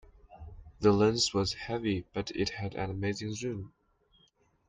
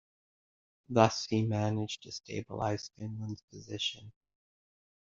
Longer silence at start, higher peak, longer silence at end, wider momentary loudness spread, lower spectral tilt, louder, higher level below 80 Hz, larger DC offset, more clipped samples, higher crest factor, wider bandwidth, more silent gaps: second, 0.3 s vs 0.9 s; second, -12 dBFS vs -8 dBFS; about the same, 1 s vs 1.05 s; first, 25 LU vs 15 LU; about the same, -5 dB/octave vs -5 dB/octave; about the same, -31 LUFS vs -33 LUFS; first, -54 dBFS vs -68 dBFS; neither; neither; second, 20 dB vs 28 dB; first, 9.6 kHz vs 7.6 kHz; second, none vs 3.44-3.48 s